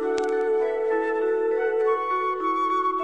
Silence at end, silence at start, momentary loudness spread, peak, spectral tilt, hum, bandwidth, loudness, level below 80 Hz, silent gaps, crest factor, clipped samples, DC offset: 0 s; 0 s; 2 LU; -14 dBFS; -4 dB/octave; none; 9 kHz; -24 LUFS; -62 dBFS; none; 10 dB; under 0.1%; 0.2%